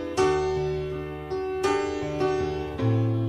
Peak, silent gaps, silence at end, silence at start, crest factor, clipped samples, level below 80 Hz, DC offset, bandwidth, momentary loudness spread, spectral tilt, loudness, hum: -10 dBFS; none; 0 s; 0 s; 16 dB; under 0.1%; -46 dBFS; under 0.1%; 11 kHz; 8 LU; -6.5 dB/octave; -27 LUFS; none